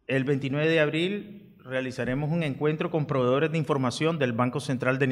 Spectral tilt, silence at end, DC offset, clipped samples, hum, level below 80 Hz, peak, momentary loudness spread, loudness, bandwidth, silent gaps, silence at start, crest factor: -6.5 dB/octave; 0 s; under 0.1%; under 0.1%; none; -60 dBFS; -10 dBFS; 7 LU; -27 LUFS; 12 kHz; none; 0.1 s; 16 dB